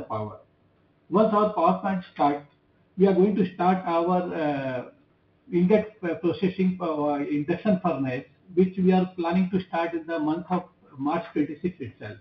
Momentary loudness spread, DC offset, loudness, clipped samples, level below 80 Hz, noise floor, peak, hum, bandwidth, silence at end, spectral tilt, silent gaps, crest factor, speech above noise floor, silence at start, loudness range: 11 LU; under 0.1%; -25 LUFS; under 0.1%; -64 dBFS; -63 dBFS; -6 dBFS; none; 5.6 kHz; 0 s; -10 dB/octave; none; 18 dB; 39 dB; 0 s; 3 LU